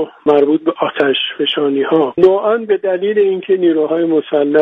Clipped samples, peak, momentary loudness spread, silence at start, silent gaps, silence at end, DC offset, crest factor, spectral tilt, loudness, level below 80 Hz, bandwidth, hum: under 0.1%; 0 dBFS; 4 LU; 0 s; none; 0 s; under 0.1%; 14 dB; -7.5 dB/octave; -14 LUFS; -60 dBFS; 4.7 kHz; none